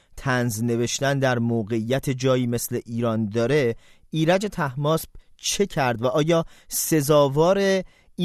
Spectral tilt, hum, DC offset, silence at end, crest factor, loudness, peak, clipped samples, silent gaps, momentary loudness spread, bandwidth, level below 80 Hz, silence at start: -5 dB/octave; none; under 0.1%; 0 s; 18 dB; -23 LUFS; -6 dBFS; under 0.1%; none; 8 LU; 14 kHz; -50 dBFS; 0.15 s